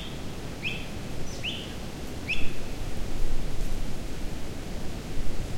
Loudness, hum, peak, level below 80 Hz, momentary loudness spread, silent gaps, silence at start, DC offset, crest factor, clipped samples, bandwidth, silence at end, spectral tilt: -35 LUFS; none; -10 dBFS; -32 dBFS; 6 LU; none; 0 s; under 0.1%; 16 dB; under 0.1%; 13.5 kHz; 0 s; -4.5 dB/octave